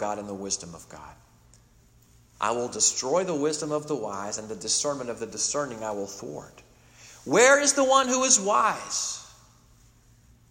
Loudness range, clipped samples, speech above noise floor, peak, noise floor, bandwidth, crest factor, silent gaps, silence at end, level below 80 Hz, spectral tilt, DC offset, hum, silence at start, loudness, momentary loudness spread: 7 LU; under 0.1%; 32 dB; -4 dBFS; -58 dBFS; 16 kHz; 24 dB; none; 1.25 s; -62 dBFS; -1.5 dB/octave; under 0.1%; none; 0 s; -24 LUFS; 19 LU